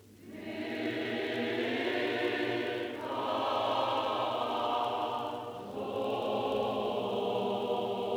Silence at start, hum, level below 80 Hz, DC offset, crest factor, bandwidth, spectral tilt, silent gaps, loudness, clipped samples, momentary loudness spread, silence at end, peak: 0.05 s; none; -72 dBFS; under 0.1%; 14 dB; over 20 kHz; -5.5 dB/octave; none; -33 LUFS; under 0.1%; 7 LU; 0 s; -20 dBFS